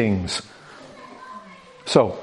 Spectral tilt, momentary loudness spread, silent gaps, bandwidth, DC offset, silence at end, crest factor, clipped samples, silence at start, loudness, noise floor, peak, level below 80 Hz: -5 dB/octave; 24 LU; none; 11.5 kHz; under 0.1%; 0 s; 24 dB; under 0.1%; 0 s; -22 LUFS; -44 dBFS; 0 dBFS; -54 dBFS